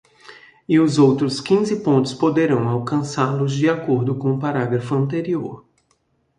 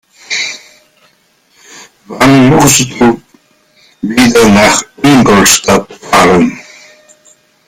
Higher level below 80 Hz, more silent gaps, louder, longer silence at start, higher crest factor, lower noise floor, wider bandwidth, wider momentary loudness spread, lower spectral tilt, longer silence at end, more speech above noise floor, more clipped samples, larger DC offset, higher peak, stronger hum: second, -60 dBFS vs -36 dBFS; neither; second, -19 LUFS vs -7 LUFS; about the same, 0.3 s vs 0.3 s; first, 16 dB vs 10 dB; first, -65 dBFS vs -51 dBFS; second, 11 kHz vs over 20 kHz; second, 7 LU vs 14 LU; first, -7 dB/octave vs -4 dB/octave; second, 0.8 s vs 1.05 s; about the same, 47 dB vs 45 dB; second, under 0.1% vs 0.3%; neither; about the same, -2 dBFS vs 0 dBFS; neither